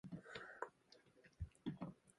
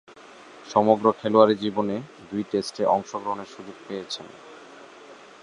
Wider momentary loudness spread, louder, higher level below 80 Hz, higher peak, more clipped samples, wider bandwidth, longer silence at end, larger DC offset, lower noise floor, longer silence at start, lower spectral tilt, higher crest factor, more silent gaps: second, 17 LU vs 24 LU; second, -53 LUFS vs -24 LUFS; about the same, -64 dBFS vs -66 dBFS; second, -28 dBFS vs -2 dBFS; neither; about the same, 11 kHz vs 11 kHz; second, 0.05 s vs 0.3 s; neither; first, -71 dBFS vs -47 dBFS; second, 0.05 s vs 0.55 s; about the same, -6.5 dB/octave vs -6 dB/octave; about the same, 26 dB vs 22 dB; neither